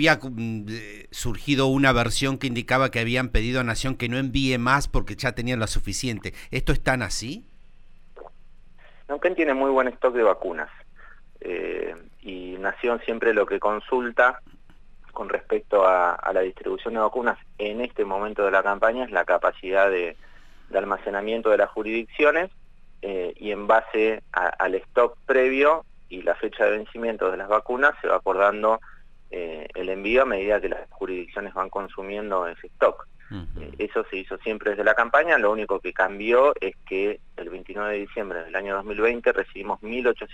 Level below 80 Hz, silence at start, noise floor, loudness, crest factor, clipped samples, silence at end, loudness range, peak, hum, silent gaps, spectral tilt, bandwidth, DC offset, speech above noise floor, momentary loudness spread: -40 dBFS; 0 s; -46 dBFS; -24 LUFS; 18 dB; under 0.1%; 0 s; 5 LU; -6 dBFS; none; none; -5 dB/octave; 16 kHz; under 0.1%; 22 dB; 13 LU